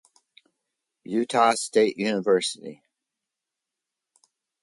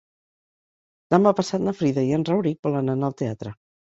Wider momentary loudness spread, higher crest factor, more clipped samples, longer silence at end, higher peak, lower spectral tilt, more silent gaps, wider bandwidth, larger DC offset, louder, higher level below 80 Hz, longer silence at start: about the same, 11 LU vs 11 LU; about the same, 20 dB vs 22 dB; neither; first, 1.9 s vs 0.45 s; second, -6 dBFS vs -2 dBFS; second, -3.5 dB/octave vs -7.5 dB/octave; second, none vs 2.59-2.63 s; first, 11.5 kHz vs 8 kHz; neither; about the same, -23 LUFS vs -23 LUFS; second, -76 dBFS vs -60 dBFS; about the same, 1.1 s vs 1.1 s